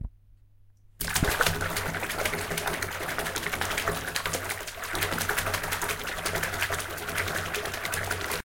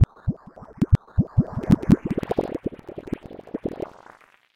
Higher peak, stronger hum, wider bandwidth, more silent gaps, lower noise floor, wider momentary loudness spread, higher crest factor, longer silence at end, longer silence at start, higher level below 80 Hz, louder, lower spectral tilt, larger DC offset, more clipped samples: about the same, -6 dBFS vs -4 dBFS; neither; first, 17 kHz vs 12 kHz; neither; first, -56 dBFS vs -52 dBFS; second, 5 LU vs 16 LU; about the same, 24 dB vs 20 dB; second, 0.05 s vs 0.75 s; about the same, 0 s vs 0 s; second, -44 dBFS vs -36 dBFS; second, -29 LUFS vs -24 LUFS; second, -2.5 dB/octave vs -9.5 dB/octave; neither; neither